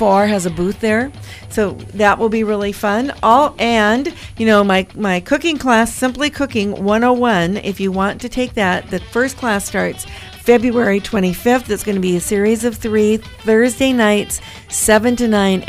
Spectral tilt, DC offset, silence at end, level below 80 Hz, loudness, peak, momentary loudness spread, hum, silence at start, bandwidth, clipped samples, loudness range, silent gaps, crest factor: -4.5 dB/octave; under 0.1%; 0 s; -40 dBFS; -16 LUFS; 0 dBFS; 8 LU; none; 0 s; 16 kHz; under 0.1%; 3 LU; none; 14 dB